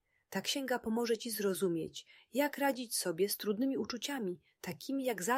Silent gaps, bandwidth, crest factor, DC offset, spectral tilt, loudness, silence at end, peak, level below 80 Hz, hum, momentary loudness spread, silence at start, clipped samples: none; 16 kHz; 16 dB; under 0.1%; -3.5 dB/octave; -36 LUFS; 0 s; -20 dBFS; -76 dBFS; none; 9 LU; 0.3 s; under 0.1%